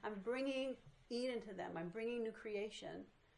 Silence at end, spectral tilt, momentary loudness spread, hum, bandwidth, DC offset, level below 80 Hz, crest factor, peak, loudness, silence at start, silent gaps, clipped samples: 0.25 s; -5 dB/octave; 9 LU; none; 11 kHz; under 0.1%; -76 dBFS; 14 dB; -32 dBFS; -45 LUFS; 0 s; none; under 0.1%